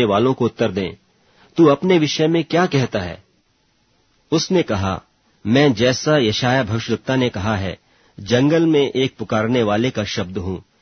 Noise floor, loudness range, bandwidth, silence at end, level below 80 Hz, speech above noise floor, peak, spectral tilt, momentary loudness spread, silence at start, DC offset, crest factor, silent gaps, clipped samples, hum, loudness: -62 dBFS; 2 LU; 6.6 kHz; 0.2 s; -50 dBFS; 45 dB; -2 dBFS; -5.5 dB/octave; 13 LU; 0 s; under 0.1%; 18 dB; none; under 0.1%; none; -18 LUFS